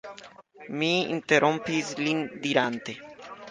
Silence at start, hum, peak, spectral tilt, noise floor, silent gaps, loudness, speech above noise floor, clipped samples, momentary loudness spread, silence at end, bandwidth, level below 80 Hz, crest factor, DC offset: 0.05 s; none; -6 dBFS; -4.5 dB/octave; -49 dBFS; none; -26 LUFS; 22 dB; under 0.1%; 21 LU; 0 s; 9.8 kHz; -70 dBFS; 22 dB; under 0.1%